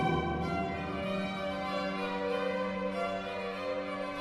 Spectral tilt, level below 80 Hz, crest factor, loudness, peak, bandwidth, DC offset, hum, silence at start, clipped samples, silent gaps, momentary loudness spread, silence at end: -6.5 dB/octave; -52 dBFS; 16 dB; -34 LUFS; -18 dBFS; 12.5 kHz; under 0.1%; none; 0 s; under 0.1%; none; 3 LU; 0 s